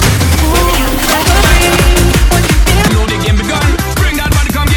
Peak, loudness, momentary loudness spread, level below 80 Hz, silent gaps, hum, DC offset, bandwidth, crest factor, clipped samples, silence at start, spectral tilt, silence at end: 0 dBFS; -10 LUFS; 4 LU; -12 dBFS; none; none; under 0.1%; 19 kHz; 8 dB; 0.2%; 0 s; -4 dB/octave; 0 s